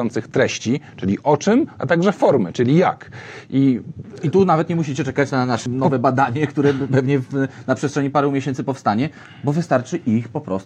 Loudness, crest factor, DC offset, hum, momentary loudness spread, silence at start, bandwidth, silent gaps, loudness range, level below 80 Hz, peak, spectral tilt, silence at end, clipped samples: -19 LUFS; 18 dB; under 0.1%; none; 8 LU; 0 s; 9 kHz; none; 2 LU; -60 dBFS; -2 dBFS; -7 dB/octave; 0 s; under 0.1%